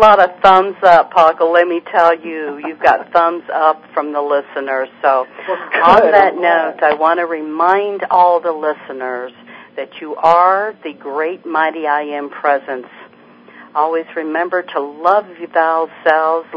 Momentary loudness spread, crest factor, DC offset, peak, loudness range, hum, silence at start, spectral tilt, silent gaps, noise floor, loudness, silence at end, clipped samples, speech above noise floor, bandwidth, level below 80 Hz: 14 LU; 14 dB; under 0.1%; 0 dBFS; 7 LU; none; 0 s; -5.5 dB/octave; none; -43 dBFS; -14 LUFS; 0 s; 0.4%; 29 dB; 8 kHz; -54 dBFS